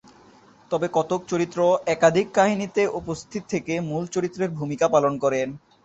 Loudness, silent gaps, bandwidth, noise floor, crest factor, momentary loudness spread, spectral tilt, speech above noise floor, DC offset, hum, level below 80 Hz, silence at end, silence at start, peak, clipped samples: -23 LUFS; none; 8.2 kHz; -52 dBFS; 20 dB; 10 LU; -5.5 dB/octave; 30 dB; under 0.1%; none; -60 dBFS; 0.3 s; 0.7 s; -4 dBFS; under 0.1%